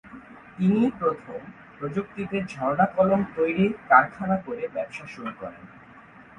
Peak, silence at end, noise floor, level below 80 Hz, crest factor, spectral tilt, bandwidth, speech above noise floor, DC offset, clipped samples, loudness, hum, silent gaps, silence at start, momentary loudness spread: -2 dBFS; 0.15 s; -49 dBFS; -58 dBFS; 24 dB; -8 dB/octave; 9.2 kHz; 24 dB; under 0.1%; under 0.1%; -24 LUFS; none; none; 0.05 s; 21 LU